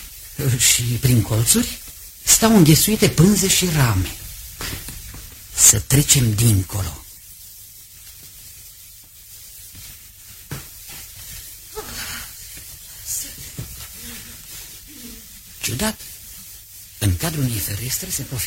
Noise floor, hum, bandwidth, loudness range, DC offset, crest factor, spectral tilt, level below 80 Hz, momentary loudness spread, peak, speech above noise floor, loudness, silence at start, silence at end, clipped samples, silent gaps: -43 dBFS; none; 16.5 kHz; 20 LU; under 0.1%; 22 dB; -3.5 dB/octave; -38 dBFS; 24 LU; 0 dBFS; 26 dB; -17 LUFS; 0 s; 0 s; under 0.1%; none